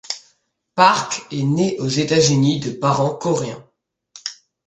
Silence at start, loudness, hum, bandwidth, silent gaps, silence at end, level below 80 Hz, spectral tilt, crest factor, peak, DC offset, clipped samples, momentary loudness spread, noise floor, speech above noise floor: 0.1 s; -18 LUFS; none; 9.6 kHz; none; 0.35 s; -56 dBFS; -4.5 dB/octave; 20 dB; 0 dBFS; under 0.1%; under 0.1%; 16 LU; -66 dBFS; 49 dB